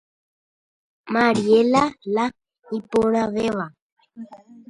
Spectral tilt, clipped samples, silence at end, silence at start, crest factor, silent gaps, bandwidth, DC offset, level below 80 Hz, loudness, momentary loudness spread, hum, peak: -5.5 dB/octave; under 0.1%; 0.35 s; 1.05 s; 18 dB; 3.82-3.96 s; 11 kHz; under 0.1%; -58 dBFS; -21 LUFS; 24 LU; none; -4 dBFS